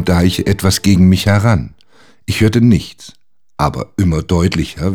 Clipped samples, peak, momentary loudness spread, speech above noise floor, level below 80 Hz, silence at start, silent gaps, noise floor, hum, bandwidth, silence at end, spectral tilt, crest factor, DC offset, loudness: under 0.1%; 0 dBFS; 9 LU; 37 dB; -30 dBFS; 0 s; none; -50 dBFS; none; 17.5 kHz; 0 s; -6 dB/octave; 14 dB; under 0.1%; -13 LUFS